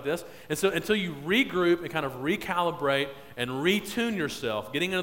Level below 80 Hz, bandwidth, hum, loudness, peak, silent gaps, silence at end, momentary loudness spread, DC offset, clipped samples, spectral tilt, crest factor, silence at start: -58 dBFS; 16.5 kHz; none; -28 LUFS; -10 dBFS; none; 0 s; 8 LU; 0.1%; under 0.1%; -4.5 dB/octave; 18 dB; 0 s